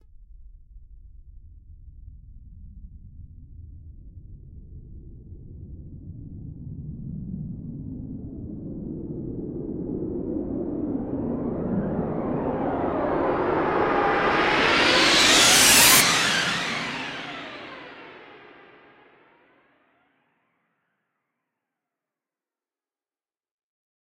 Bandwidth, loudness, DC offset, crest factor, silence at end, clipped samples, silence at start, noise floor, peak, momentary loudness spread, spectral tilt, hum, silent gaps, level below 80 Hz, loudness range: 16 kHz; -20 LUFS; under 0.1%; 24 dB; 5.5 s; under 0.1%; 0.2 s; under -90 dBFS; -2 dBFS; 26 LU; -2 dB/octave; none; none; -46 dBFS; 23 LU